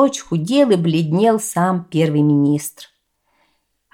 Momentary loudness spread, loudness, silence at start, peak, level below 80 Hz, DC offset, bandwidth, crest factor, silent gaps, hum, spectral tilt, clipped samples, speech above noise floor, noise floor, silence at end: 6 LU; -17 LUFS; 0 s; -2 dBFS; -62 dBFS; under 0.1%; 17 kHz; 14 dB; none; none; -6 dB/octave; under 0.1%; 49 dB; -65 dBFS; 1.1 s